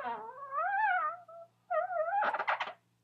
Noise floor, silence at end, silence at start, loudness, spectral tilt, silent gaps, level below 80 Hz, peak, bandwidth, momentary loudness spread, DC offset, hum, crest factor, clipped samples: -54 dBFS; 0.3 s; 0 s; -34 LUFS; -3 dB/octave; none; under -90 dBFS; -20 dBFS; 7.2 kHz; 12 LU; under 0.1%; none; 16 dB; under 0.1%